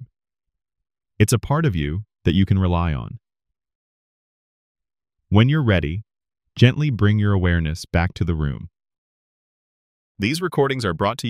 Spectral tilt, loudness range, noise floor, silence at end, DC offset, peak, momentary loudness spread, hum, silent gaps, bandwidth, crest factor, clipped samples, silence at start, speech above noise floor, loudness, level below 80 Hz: -6.5 dB/octave; 5 LU; under -90 dBFS; 0 s; under 0.1%; 0 dBFS; 10 LU; none; 3.75-4.75 s, 8.98-10.15 s; 14.5 kHz; 22 dB; under 0.1%; 0 s; over 71 dB; -20 LUFS; -38 dBFS